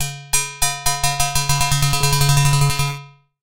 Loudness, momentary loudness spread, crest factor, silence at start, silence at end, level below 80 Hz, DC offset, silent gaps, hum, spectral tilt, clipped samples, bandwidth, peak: -17 LUFS; 5 LU; 16 dB; 0 s; 0.35 s; -32 dBFS; under 0.1%; none; none; -3 dB/octave; under 0.1%; 17.5 kHz; -2 dBFS